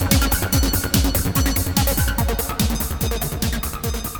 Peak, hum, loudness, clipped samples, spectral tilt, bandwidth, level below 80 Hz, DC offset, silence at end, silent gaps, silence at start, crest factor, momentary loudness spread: -2 dBFS; none; -20 LUFS; under 0.1%; -4 dB/octave; 17.5 kHz; -24 dBFS; under 0.1%; 0 s; none; 0 s; 18 dB; 5 LU